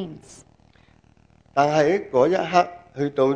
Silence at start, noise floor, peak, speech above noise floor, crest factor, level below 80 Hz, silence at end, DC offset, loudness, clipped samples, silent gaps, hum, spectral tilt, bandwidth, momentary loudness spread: 0 s; -56 dBFS; -2 dBFS; 36 dB; 20 dB; -60 dBFS; 0 s; under 0.1%; -21 LUFS; under 0.1%; none; none; -6 dB/octave; 9.8 kHz; 10 LU